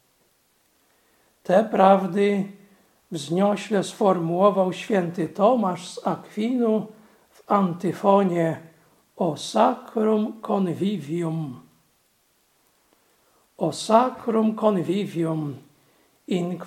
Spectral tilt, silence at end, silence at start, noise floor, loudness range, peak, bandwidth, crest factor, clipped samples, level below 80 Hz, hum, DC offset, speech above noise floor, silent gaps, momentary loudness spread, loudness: -6.5 dB/octave; 0 s; 1.5 s; -65 dBFS; 5 LU; -2 dBFS; 14.5 kHz; 22 dB; under 0.1%; -74 dBFS; none; under 0.1%; 43 dB; none; 10 LU; -23 LUFS